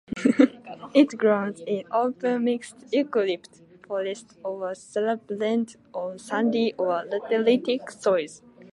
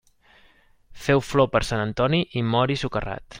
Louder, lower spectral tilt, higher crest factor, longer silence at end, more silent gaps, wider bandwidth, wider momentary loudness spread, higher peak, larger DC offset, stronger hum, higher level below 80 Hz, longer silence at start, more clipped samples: about the same, -25 LUFS vs -23 LUFS; about the same, -5.5 dB/octave vs -6 dB/octave; about the same, 22 dB vs 18 dB; about the same, 0.1 s vs 0 s; neither; second, 11.5 kHz vs 16.5 kHz; first, 12 LU vs 9 LU; about the same, -4 dBFS vs -6 dBFS; neither; neither; second, -70 dBFS vs -44 dBFS; second, 0.1 s vs 0.95 s; neither